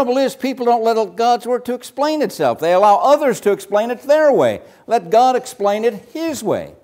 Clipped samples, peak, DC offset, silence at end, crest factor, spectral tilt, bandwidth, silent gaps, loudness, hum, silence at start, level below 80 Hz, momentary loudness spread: under 0.1%; -2 dBFS; under 0.1%; 0.15 s; 14 dB; -4.5 dB/octave; 16 kHz; none; -16 LUFS; none; 0 s; -64 dBFS; 9 LU